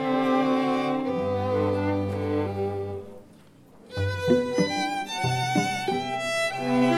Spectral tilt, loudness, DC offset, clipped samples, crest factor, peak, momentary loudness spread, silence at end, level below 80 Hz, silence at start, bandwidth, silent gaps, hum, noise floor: -5.5 dB/octave; -26 LUFS; under 0.1%; under 0.1%; 18 dB; -8 dBFS; 7 LU; 0 s; -62 dBFS; 0 s; 16 kHz; none; none; -52 dBFS